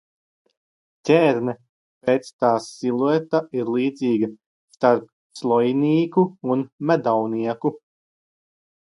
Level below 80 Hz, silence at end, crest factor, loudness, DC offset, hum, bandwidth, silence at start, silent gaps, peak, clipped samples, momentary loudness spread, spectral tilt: -70 dBFS; 1.25 s; 20 dB; -21 LUFS; under 0.1%; none; 11.5 kHz; 1.05 s; 1.69-2.01 s, 2.33-2.39 s, 4.46-4.68 s, 5.12-5.30 s, 6.72-6.78 s; -2 dBFS; under 0.1%; 9 LU; -7 dB/octave